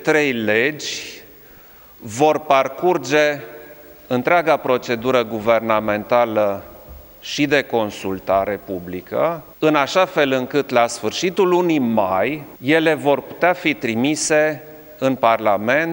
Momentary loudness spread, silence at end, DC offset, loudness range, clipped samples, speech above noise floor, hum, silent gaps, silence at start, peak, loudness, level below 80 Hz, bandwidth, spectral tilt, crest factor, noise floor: 11 LU; 0 s; under 0.1%; 3 LU; under 0.1%; 26 dB; none; none; 0 s; 0 dBFS; -18 LUFS; -54 dBFS; 17 kHz; -4.5 dB/octave; 18 dB; -44 dBFS